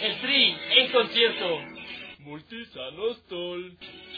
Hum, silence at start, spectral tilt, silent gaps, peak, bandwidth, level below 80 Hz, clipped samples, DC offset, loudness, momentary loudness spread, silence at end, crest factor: none; 0 s; -5 dB/octave; none; -6 dBFS; 5 kHz; -68 dBFS; under 0.1%; under 0.1%; -23 LUFS; 21 LU; 0 s; 22 dB